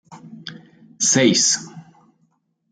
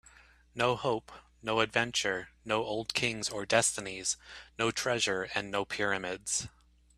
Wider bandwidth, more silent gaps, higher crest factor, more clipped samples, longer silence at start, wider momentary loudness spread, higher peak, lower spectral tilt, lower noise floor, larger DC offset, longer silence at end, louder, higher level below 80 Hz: second, 10.5 kHz vs 14.5 kHz; neither; second, 18 dB vs 24 dB; neither; second, 0.1 s vs 0.55 s; first, 23 LU vs 9 LU; first, -4 dBFS vs -8 dBFS; about the same, -2.5 dB/octave vs -2.5 dB/octave; first, -66 dBFS vs -59 dBFS; neither; first, 0.9 s vs 0.5 s; first, -16 LUFS vs -31 LUFS; about the same, -66 dBFS vs -62 dBFS